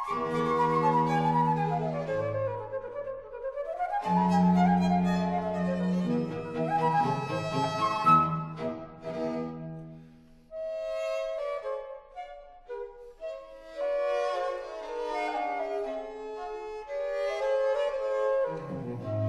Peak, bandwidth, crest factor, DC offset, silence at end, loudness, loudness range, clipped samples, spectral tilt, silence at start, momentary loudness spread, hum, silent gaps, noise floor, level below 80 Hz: -10 dBFS; 11.5 kHz; 20 dB; under 0.1%; 0 s; -29 LUFS; 9 LU; under 0.1%; -7.5 dB/octave; 0 s; 17 LU; none; none; -54 dBFS; -58 dBFS